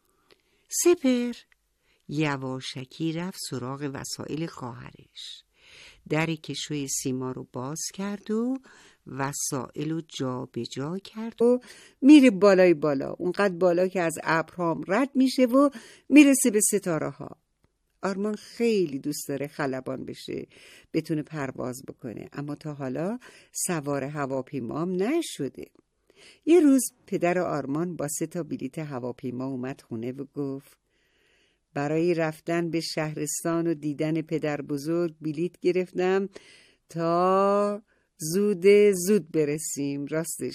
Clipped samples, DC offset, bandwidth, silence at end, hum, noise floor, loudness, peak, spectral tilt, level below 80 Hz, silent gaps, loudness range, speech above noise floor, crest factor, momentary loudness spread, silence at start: under 0.1%; under 0.1%; 15.5 kHz; 0 s; none; -71 dBFS; -26 LUFS; -4 dBFS; -5 dB/octave; -68 dBFS; none; 12 LU; 45 dB; 22 dB; 16 LU; 0.7 s